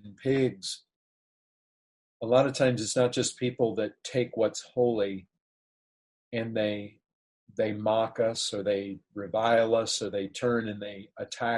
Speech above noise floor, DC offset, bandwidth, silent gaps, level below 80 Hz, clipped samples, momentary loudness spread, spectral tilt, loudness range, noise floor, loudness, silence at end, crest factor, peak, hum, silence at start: over 62 dB; under 0.1%; 11.5 kHz; 0.96-2.20 s, 5.41-6.31 s, 7.13-7.47 s; -68 dBFS; under 0.1%; 15 LU; -4.5 dB/octave; 5 LU; under -90 dBFS; -28 LUFS; 0 s; 20 dB; -10 dBFS; none; 0.05 s